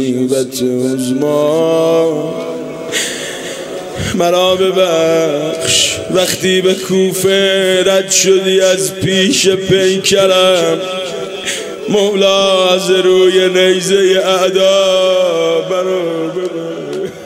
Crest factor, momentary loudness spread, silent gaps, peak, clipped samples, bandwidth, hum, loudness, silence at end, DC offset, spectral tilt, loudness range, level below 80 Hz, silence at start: 12 dB; 11 LU; none; 0 dBFS; under 0.1%; 16.5 kHz; none; -12 LUFS; 0 s; under 0.1%; -3.5 dB/octave; 4 LU; -48 dBFS; 0 s